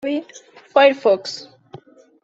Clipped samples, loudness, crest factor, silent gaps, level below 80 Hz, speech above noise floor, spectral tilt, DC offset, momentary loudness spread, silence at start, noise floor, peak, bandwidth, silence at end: under 0.1%; -17 LUFS; 18 dB; none; -70 dBFS; 26 dB; -3.5 dB/octave; under 0.1%; 16 LU; 0.05 s; -44 dBFS; -2 dBFS; 7.8 kHz; 0.8 s